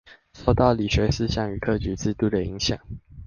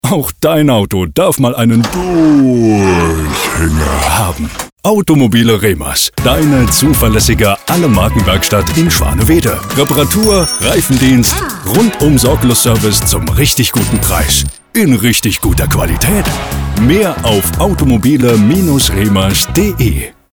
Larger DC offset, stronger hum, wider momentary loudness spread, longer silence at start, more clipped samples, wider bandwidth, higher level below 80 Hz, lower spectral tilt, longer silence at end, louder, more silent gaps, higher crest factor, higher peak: neither; neither; about the same, 7 LU vs 5 LU; about the same, 0.1 s vs 0.05 s; neither; second, 7.2 kHz vs over 20 kHz; second, -36 dBFS vs -22 dBFS; first, -6 dB/octave vs -4.5 dB/octave; second, 0 s vs 0.25 s; second, -24 LUFS vs -10 LUFS; second, none vs 4.72-4.76 s; first, 20 dB vs 10 dB; second, -4 dBFS vs 0 dBFS